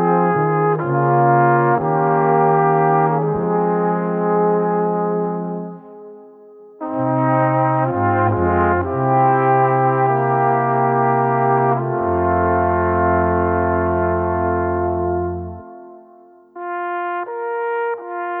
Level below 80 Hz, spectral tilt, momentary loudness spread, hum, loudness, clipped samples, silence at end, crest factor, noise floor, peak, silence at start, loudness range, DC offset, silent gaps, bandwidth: -44 dBFS; -13 dB/octave; 10 LU; none; -17 LUFS; under 0.1%; 0 s; 14 dB; -46 dBFS; -4 dBFS; 0 s; 6 LU; under 0.1%; none; 3.6 kHz